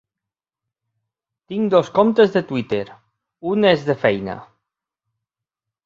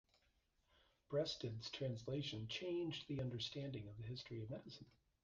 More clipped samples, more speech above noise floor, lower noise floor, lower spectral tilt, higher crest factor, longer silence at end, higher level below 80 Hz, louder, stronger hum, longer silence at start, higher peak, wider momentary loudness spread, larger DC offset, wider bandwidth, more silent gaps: neither; first, 69 dB vs 34 dB; first, -87 dBFS vs -81 dBFS; about the same, -7 dB/octave vs -6 dB/octave; about the same, 20 dB vs 18 dB; first, 1.4 s vs 0.35 s; first, -60 dBFS vs -72 dBFS; first, -18 LUFS vs -47 LUFS; neither; first, 1.5 s vs 1.1 s; first, -2 dBFS vs -30 dBFS; first, 15 LU vs 8 LU; neither; about the same, 7.4 kHz vs 7.6 kHz; neither